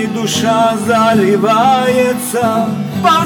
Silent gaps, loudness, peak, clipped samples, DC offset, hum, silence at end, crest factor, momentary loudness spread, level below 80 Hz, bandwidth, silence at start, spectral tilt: none; -12 LUFS; 0 dBFS; under 0.1%; under 0.1%; none; 0 s; 12 dB; 5 LU; -60 dBFS; over 20 kHz; 0 s; -4.5 dB/octave